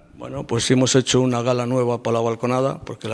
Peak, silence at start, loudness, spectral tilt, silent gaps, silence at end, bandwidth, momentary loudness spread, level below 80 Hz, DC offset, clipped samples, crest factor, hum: -2 dBFS; 0.15 s; -20 LUFS; -5 dB/octave; none; 0 s; 11 kHz; 11 LU; -52 dBFS; under 0.1%; under 0.1%; 18 dB; none